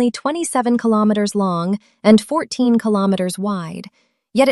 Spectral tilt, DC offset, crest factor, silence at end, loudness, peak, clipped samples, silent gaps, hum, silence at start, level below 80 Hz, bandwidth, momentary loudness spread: -5.5 dB/octave; under 0.1%; 16 dB; 0 s; -17 LUFS; -2 dBFS; under 0.1%; none; none; 0 s; -60 dBFS; 12.5 kHz; 10 LU